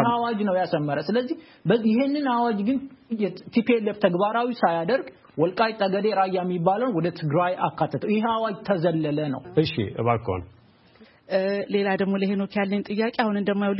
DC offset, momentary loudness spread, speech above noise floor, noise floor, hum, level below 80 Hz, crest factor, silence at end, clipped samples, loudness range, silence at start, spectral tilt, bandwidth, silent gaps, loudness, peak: under 0.1%; 5 LU; 30 dB; -54 dBFS; none; -62 dBFS; 18 dB; 0 s; under 0.1%; 3 LU; 0 s; -11 dB/octave; 5.8 kHz; none; -24 LUFS; -6 dBFS